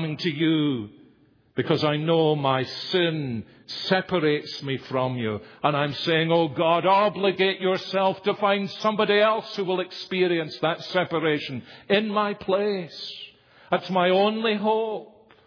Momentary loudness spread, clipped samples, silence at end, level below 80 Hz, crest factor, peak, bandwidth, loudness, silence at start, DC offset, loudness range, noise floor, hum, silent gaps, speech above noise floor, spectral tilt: 11 LU; under 0.1%; 0.4 s; -68 dBFS; 18 dB; -6 dBFS; 5.4 kHz; -24 LUFS; 0 s; under 0.1%; 3 LU; -59 dBFS; none; none; 35 dB; -6.5 dB/octave